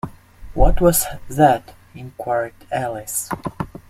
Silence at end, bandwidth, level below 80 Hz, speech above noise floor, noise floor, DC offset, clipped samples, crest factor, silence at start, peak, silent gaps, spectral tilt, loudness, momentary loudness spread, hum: 0.25 s; 16 kHz; -26 dBFS; 18 dB; -37 dBFS; under 0.1%; under 0.1%; 18 dB; 0.05 s; -2 dBFS; none; -5 dB/octave; -20 LUFS; 17 LU; none